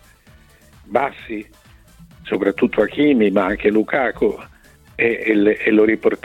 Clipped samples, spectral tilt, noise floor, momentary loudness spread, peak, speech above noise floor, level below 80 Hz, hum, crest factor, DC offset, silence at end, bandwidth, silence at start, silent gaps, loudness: under 0.1%; -7 dB/octave; -49 dBFS; 16 LU; -2 dBFS; 32 dB; -48 dBFS; none; 16 dB; under 0.1%; 0.1 s; 10 kHz; 0.9 s; none; -17 LUFS